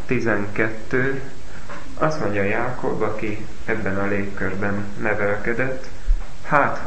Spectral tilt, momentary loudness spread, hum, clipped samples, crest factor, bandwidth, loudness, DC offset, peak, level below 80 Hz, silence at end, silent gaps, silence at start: -7 dB/octave; 10 LU; none; under 0.1%; 22 dB; 8.8 kHz; -24 LUFS; 9%; 0 dBFS; -32 dBFS; 0 s; none; 0 s